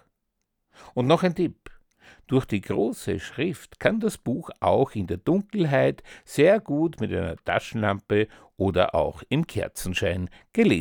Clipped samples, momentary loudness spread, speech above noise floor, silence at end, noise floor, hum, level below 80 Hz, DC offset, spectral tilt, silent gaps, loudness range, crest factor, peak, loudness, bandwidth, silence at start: under 0.1%; 9 LU; 54 dB; 0 s; -78 dBFS; none; -50 dBFS; under 0.1%; -6.5 dB/octave; none; 3 LU; 20 dB; -4 dBFS; -25 LUFS; 19.5 kHz; 0.85 s